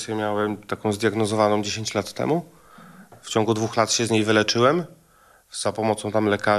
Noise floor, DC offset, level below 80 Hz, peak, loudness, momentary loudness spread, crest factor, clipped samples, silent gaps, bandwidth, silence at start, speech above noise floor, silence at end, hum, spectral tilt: -56 dBFS; under 0.1%; -64 dBFS; -4 dBFS; -22 LUFS; 8 LU; 20 dB; under 0.1%; none; 13.5 kHz; 0 s; 34 dB; 0 s; none; -4.5 dB/octave